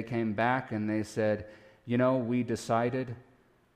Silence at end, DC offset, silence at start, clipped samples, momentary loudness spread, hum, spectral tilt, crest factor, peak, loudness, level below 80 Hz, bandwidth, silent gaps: 0.55 s; under 0.1%; 0 s; under 0.1%; 13 LU; none; -7 dB/octave; 16 dB; -14 dBFS; -30 LUFS; -64 dBFS; 13 kHz; none